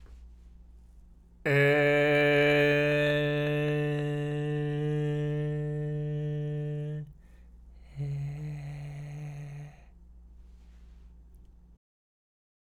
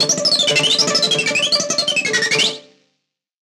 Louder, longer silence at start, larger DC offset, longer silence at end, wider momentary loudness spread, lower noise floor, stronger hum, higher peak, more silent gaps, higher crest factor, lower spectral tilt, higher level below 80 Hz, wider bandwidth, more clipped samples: second, -28 LUFS vs -14 LUFS; about the same, 0 s vs 0 s; neither; first, 1.3 s vs 0.85 s; first, 18 LU vs 3 LU; second, -54 dBFS vs -73 dBFS; neither; second, -14 dBFS vs -4 dBFS; neither; about the same, 16 dB vs 14 dB; first, -7 dB/octave vs -1 dB/octave; first, -52 dBFS vs -68 dBFS; second, 12.5 kHz vs 16 kHz; neither